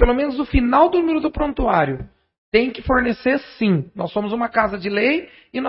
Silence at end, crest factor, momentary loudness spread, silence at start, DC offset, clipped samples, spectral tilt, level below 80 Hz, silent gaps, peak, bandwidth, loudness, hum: 0 s; 18 dB; 8 LU; 0 s; under 0.1%; under 0.1%; -11 dB/octave; -30 dBFS; 2.38-2.52 s; 0 dBFS; 5.8 kHz; -19 LUFS; none